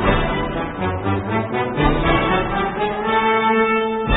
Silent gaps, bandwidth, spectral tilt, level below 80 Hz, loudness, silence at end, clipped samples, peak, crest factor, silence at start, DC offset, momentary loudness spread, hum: none; 4.1 kHz; -11.5 dB/octave; -30 dBFS; -19 LUFS; 0 s; under 0.1%; -2 dBFS; 16 dB; 0 s; under 0.1%; 6 LU; none